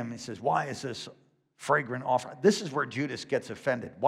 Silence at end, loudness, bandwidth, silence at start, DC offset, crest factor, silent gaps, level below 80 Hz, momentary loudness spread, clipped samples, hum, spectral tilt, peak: 0 s; -30 LUFS; 14 kHz; 0 s; under 0.1%; 20 dB; none; -74 dBFS; 12 LU; under 0.1%; none; -5 dB/octave; -10 dBFS